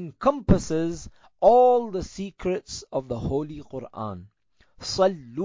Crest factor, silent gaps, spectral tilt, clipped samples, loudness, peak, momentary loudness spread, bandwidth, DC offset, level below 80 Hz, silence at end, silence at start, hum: 18 dB; none; -6 dB/octave; under 0.1%; -24 LUFS; -6 dBFS; 18 LU; 7.6 kHz; under 0.1%; -42 dBFS; 0 s; 0 s; none